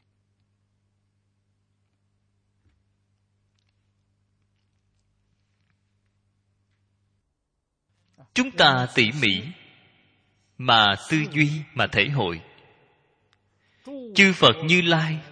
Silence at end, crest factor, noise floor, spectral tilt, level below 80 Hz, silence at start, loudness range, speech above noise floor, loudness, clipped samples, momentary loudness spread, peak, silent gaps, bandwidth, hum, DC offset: 0.1 s; 24 dB; -78 dBFS; -4.5 dB/octave; -60 dBFS; 8.35 s; 5 LU; 57 dB; -20 LUFS; under 0.1%; 12 LU; -2 dBFS; none; 10 kHz; 50 Hz at -60 dBFS; under 0.1%